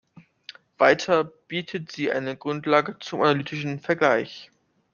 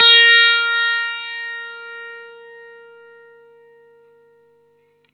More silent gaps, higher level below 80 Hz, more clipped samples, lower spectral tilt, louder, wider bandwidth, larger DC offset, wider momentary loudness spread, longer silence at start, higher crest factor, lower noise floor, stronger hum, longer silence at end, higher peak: neither; first, -68 dBFS vs -86 dBFS; neither; first, -5.5 dB/octave vs 1 dB/octave; second, -24 LUFS vs -13 LUFS; second, 7.2 kHz vs 8.4 kHz; neither; second, 22 LU vs 25 LU; first, 0.8 s vs 0 s; about the same, 22 dB vs 20 dB; second, -48 dBFS vs -58 dBFS; second, none vs 50 Hz at -75 dBFS; second, 0.5 s vs 2.85 s; about the same, -2 dBFS vs 0 dBFS